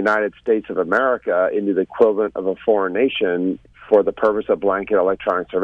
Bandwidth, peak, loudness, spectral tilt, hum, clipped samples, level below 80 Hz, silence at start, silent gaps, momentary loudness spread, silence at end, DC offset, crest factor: 6.4 kHz; -2 dBFS; -19 LUFS; -7 dB/octave; none; under 0.1%; -54 dBFS; 0 s; none; 5 LU; 0 s; under 0.1%; 16 dB